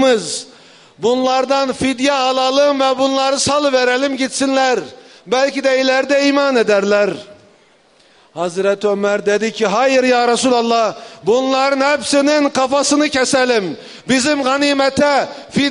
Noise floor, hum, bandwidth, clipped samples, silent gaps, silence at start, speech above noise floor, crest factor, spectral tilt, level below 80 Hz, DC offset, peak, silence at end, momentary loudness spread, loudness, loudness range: -51 dBFS; none; 11 kHz; under 0.1%; none; 0 s; 36 dB; 12 dB; -3 dB/octave; -54 dBFS; under 0.1%; -2 dBFS; 0 s; 7 LU; -15 LUFS; 2 LU